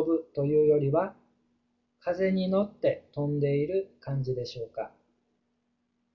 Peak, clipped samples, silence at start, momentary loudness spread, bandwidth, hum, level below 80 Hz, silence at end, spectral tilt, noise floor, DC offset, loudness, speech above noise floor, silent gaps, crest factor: -14 dBFS; under 0.1%; 0 s; 13 LU; 6.4 kHz; none; -62 dBFS; 1.25 s; -9 dB/octave; -76 dBFS; under 0.1%; -29 LUFS; 48 dB; none; 16 dB